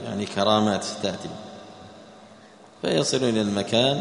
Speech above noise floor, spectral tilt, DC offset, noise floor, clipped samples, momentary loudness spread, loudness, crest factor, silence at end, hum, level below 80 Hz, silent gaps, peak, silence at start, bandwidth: 26 dB; -4.5 dB/octave; under 0.1%; -49 dBFS; under 0.1%; 22 LU; -24 LUFS; 20 dB; 0 s; none; -62 dBFS; none; -4 dBFS; 0 s; 10.5 kHz